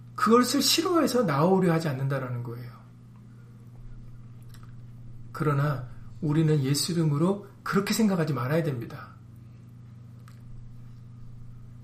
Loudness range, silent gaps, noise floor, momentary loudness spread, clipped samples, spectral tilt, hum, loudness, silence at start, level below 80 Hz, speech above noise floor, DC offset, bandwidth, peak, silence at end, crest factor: 11 LU; none; -48 dBFS; 25 LU; under 0.1%; -5.5 dB/octave; 60 Hz at -50 dBFS; -25 LUFS; 0 s; -54 dBFS; 23 dB; under 0.1%; 15.5 kHz; -8 dBFS; 0 s; 20 dB